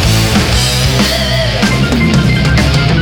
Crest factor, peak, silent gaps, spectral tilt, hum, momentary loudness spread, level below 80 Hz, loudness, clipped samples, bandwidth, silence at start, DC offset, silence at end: 10 dB; 0 dBFS; none; -4.5 dB/octave; none; 1 LU; -18 dBFS; -10 LUFS; under 0.1%; over 20 kHz; 0 s; under 0.1%; 0 s